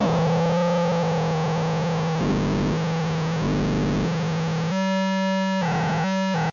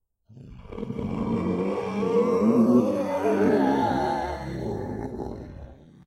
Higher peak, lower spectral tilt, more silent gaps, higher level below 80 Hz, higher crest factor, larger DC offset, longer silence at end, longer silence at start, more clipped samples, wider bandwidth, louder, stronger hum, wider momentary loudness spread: second, -14 dBFS vs -8 dBFS; second, -6.5 dB/octave vs -8 dB/octave; neither; first, -42 dBFS vs -48 dBFS; second, 8 dB vs 16 dB; neither; second, 0 s vs 0.35 s; second, 0 s vs 0.3 s; neither; second, 7.4 kHz vs 12 kHz; about the same, -23 LUFS vs -25 LUFS; neither; second, 3 LU vs 16 LU